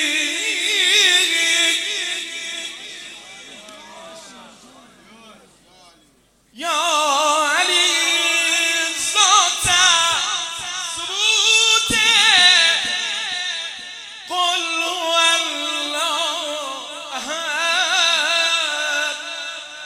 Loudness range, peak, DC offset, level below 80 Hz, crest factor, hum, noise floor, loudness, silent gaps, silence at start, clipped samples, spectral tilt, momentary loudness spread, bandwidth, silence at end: 10 LU; 0 dBFS; under 0.1%; -56 dBFS; 20 dB; none; -57 dBFS; -16 LUFS; none; 0 s; under 0.1%; 1 dB/octave; 16 LU; 16.5 kHz; 0 s